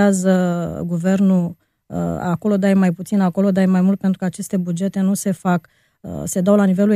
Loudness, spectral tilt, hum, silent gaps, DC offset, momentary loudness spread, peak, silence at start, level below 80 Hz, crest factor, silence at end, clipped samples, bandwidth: -18 LUFS; -7 dB/octave; none; none; under 0.1%; 9 LU; -2 dBFS; 0 s; -52 dBFS; 16 dB; 0 s; under 0.1%; 14 kHz